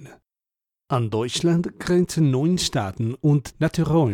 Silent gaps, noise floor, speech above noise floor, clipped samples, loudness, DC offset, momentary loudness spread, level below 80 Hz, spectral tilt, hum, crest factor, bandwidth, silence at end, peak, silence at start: none; -90 dBFS; 69 dB; under 0.1%; -22 LUFS; under 0.1%; 5 LU; -48 dBFS; -6 dB/octave; none; 14 dB; 15.5 kHz; 0 s; -8 dBFS; 0 s